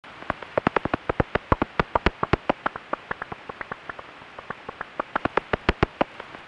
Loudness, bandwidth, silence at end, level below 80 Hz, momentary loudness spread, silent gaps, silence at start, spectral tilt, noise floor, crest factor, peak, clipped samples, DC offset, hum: -27 LUFS; 10 kHz; 0 s; -40 dBFS; 13 LU; none; 0.05 s; -7 dB/octave; -43 dBFS; 24 dB; -4 dBFS; under 0.1%; under 0.1%; none